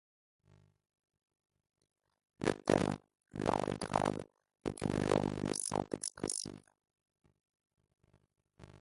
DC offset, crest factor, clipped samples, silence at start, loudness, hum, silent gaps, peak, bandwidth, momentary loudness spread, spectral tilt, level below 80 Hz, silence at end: under 0.1%; 28 dB; under 0.1%; 2.4 s; -36 LUFS; none; none; -12 dBFS; 11.5 kHz; 13 LU; -5 dB/octave; -60 dBFS; 0.05 s